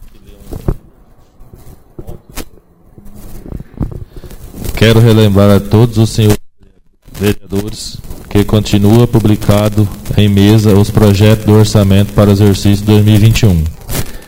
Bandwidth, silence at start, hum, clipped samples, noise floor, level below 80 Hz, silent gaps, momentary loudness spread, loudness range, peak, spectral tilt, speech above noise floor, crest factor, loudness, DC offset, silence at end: 16.5 kHz; 0 s; none; 0.7%; -44 dBFS; -24 dBFS; none; 21 LU; 20 LU; 0 dBFS; -6.5 dB/octave; 36 dB; 10 dB; -9 LUFS; under 0.1%; 0.05 s